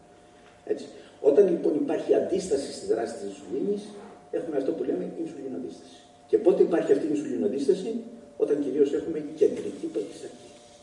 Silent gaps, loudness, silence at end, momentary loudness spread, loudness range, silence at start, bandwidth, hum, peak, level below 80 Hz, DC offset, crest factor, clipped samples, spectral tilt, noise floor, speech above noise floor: none; -27 LUFS; 0.25 s; 16 LU; 6 LU; 0.65 s; 11 kHz; none; -8 dBFS; -68 dBFS; under 0.1%; 20 dB; under 0.1%; -6 dB/octave; -53 dBFS; 27 dB